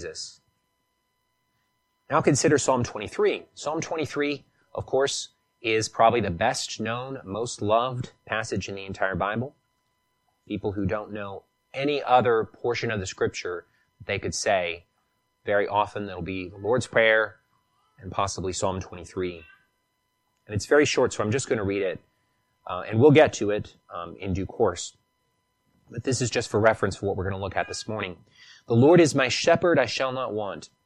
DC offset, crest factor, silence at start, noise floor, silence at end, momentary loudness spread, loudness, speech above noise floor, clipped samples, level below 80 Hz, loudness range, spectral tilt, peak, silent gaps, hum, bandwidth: under 0.1%; 22 dB; 0 s; -74 dBFS; 0.2 s; 16 LU; -25 LUFS; 50 dB; under 0.1%; -56 dBFS; 6 LU; -4.5 dB/octave; -4 dBFS; none; none; 12 kHz